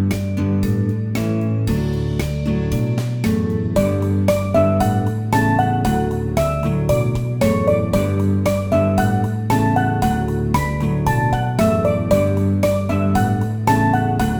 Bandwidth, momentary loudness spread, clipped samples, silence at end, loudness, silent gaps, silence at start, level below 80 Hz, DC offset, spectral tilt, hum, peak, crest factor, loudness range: over 20 kHz; 4 LU; under 0.1%; 0 s; -18 LUFS; none; 0 s; -32 dBFS; under 0.1%; -7.5 dB/octave; none; -2 dBFS; 16 dB; 2 LU